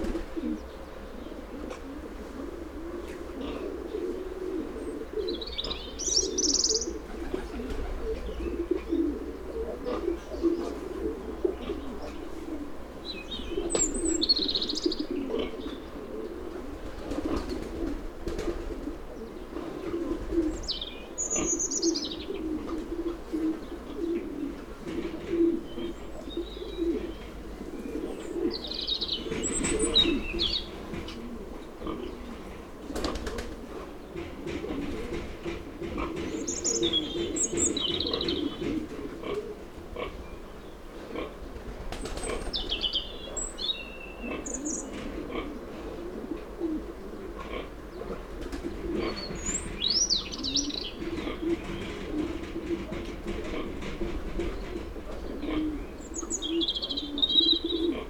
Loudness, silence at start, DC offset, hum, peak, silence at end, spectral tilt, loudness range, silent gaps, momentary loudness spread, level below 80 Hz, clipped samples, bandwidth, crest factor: -31 LUFS; 0 s; under 0.1%; none; -10 dBFS; 0 s; -3 dB/octave; 9 LU; none; 14 LU; -42 dBFS; under 0.1%; 19 kHz; 22 dB